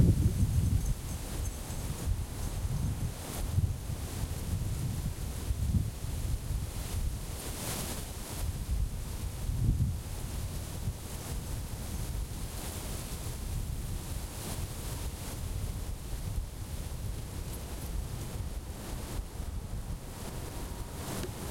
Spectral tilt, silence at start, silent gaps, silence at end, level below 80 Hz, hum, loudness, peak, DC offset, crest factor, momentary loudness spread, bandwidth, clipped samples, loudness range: -5 dB/octave; 0 s; none; 0 s; -38 dBFS; none; -37 LUFS; -12 dBFS; under 0.1%; 22 dB; 8 LU; 16.5 kHz; under 0.1%; 5 LU